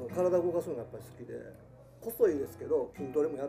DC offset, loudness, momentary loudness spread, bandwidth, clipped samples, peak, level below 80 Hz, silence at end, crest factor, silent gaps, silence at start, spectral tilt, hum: under 0.1%; -32 LUFS; 17 LU; 15.5 kHz; under 0.1%; -14 dBFS; -66 dBFS; 0 s; 18 dB; none; 0 s; -7.5 dB/octave; none